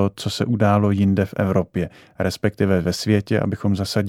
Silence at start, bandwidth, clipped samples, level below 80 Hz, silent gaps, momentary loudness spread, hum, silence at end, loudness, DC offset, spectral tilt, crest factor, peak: 0 s; 15.5 kHz; under 0.1%; -48 dBFS; none; 8 LU; none; 0 s; -21 LUFS; under 0.1%; -6.5 dB/octave; 16 dB; -4 dBFS